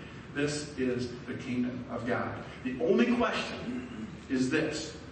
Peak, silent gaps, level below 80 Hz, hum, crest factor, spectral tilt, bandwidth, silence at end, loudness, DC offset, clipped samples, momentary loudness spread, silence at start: -12 dBFS; none; -56 dBFS; none; 20 dB; -5 dB/octave; 8.8 kHz; 0 s; -32 LUFS; under 0.1%; under 0.1%; 12 LU; 0 s